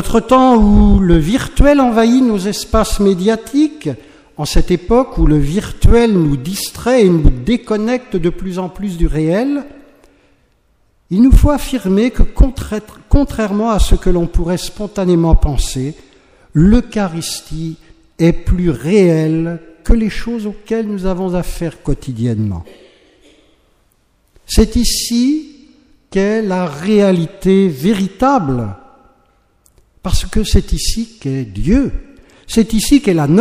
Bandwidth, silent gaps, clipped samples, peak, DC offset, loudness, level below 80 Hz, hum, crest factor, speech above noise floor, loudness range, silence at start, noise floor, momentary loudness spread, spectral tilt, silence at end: 15.5 kHz; none; under 0.1%; 0 dBFS; under 0.1%; -14 LUFS; -20 dBFS; none; 14 dB; 44 dB; 6 LU; 0 s; -56 dBFS; 12 LU; -6 dB/octave; 0 s